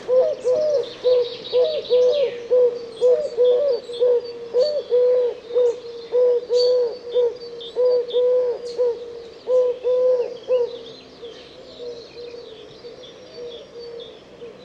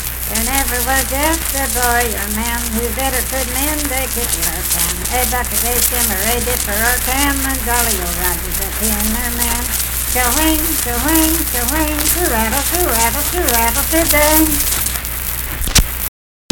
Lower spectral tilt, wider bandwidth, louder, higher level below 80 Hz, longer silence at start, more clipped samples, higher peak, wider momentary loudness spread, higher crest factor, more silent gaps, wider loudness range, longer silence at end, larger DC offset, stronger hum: first, -4 dB/octave vs -2.5 dB/octave; second, 7.6 kHz vs 19.5 kHz; second, -20 LUFS vs -14 LUFS; second, -64 dBFS vs -24 dBFS; about the same, 0 s vs 0 s; neither; second, -8 dBFS vs 0 dBFS; first, 20 LU vs 5 LU; about the same, 12 dB vs 16 dB; neither; first, 11 LU vs 3 LU; second, 0 s vs 0.45 s; neither; neither